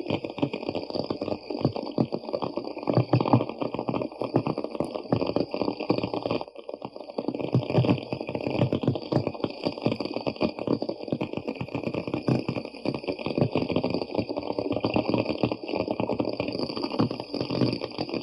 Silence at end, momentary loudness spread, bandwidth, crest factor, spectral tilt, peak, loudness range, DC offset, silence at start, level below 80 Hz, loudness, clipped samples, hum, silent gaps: 0 s; 7 LU; 10.5 kHz; 22 dB; -8.5 dB/octave; -6 dBFS; 2 LU; under 0.1%; 0 s; -60 dBFS; -29 LUFS; under 0.1%; none; none